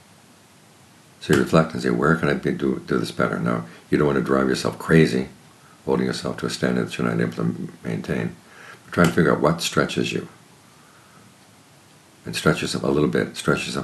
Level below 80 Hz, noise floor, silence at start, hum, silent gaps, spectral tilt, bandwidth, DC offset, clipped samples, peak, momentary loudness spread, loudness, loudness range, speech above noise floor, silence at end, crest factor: -50 dBFS; -51 dBFS; 1.2 s; none; none; -6 dB/octave; 13 kHz; under 0.1%; under 0.1%; -2 dBFS; 12 LU; -22 LUFS; 5 LU; 30 dB; 0 s; 20 dB